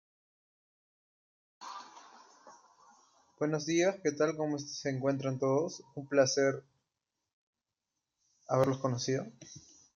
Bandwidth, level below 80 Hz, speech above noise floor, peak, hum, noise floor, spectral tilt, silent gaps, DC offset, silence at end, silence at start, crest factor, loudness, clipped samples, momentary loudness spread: 7.6 kHz; -78 dBFS; 57 dB; -14 dBFS; none; -88 dBFS; -5 dB/octave; 7.33-7.53 s; under 0.1%; 0.35 s; 1.6 s; 22 dB; -32 LUFS; under 0.1%; 19 LU